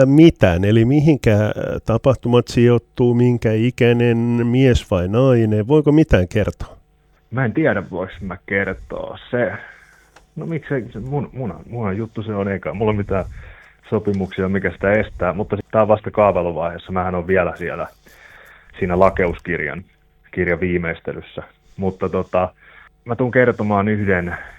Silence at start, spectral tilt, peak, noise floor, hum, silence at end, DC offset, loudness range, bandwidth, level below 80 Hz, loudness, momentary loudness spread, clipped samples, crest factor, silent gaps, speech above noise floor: 0 s; -8 dB/octave; 0 dBFS; -56 dBFS; none; 0.05 s; under 0.1%; 9 LU; 9.6 kHz; -38 dBFS; -18 LUFS; 14 LU; under 0.1%; 18 dB; none; 39 dB